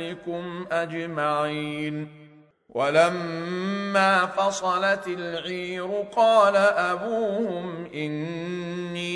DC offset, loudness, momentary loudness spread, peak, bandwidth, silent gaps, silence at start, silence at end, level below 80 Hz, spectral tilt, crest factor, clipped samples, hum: under 0.1%; -25 LUFS; 13 LU; -6 dBFS; 11 kHz; none; 0 s; 0 s; -68 dBFS; -5 dB/octave; 18 dB; under 0.1%; none